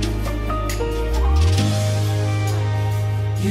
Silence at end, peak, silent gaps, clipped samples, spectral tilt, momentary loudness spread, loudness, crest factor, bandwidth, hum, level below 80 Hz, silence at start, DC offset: 0 s; -6 dBFS; none; under 0.1%; -6 dB/octave; 6 LU; -21 LUFS; 12 dB; 15 kHz; none; -24 dBFS; 0 s; under 0.1%